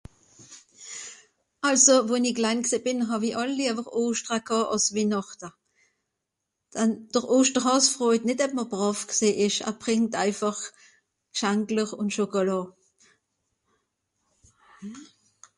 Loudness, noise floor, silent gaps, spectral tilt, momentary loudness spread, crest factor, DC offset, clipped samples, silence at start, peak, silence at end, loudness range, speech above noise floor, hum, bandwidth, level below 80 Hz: -24 LUFS; -83 dBFS; none; -3 dB/octave; 18 LU; 22 dB; under 0.1%; under 0.1%; 0.4 s; -4 dBFS; 0.55 s; 6 LU; 58 dB; none; 11.5 kHz; -68 dBFS